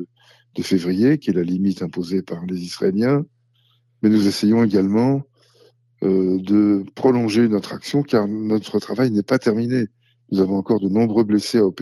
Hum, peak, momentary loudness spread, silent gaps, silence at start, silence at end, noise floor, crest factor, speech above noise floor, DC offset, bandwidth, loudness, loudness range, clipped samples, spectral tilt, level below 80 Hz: none; -4 dBFS; 8 LU; none; 0 s; 0 s; -61 dBFS; 14 dB; 43 dB; under 0.1%; 12.5 kHz; -19 LUFS; 2 LU; under 0.1%; -7 dB/octave; -64 dBFS